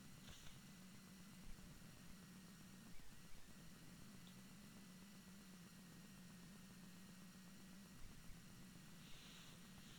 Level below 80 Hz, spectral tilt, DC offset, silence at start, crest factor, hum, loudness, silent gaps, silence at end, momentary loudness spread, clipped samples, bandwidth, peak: -70 dBFS; -4 dB/octave; under 0.1%; 0 s; 16 dB; none; -62 LUFS; none; 0 s; 2 LU; under 0.1%; 19.5 kHz; -44 dBFS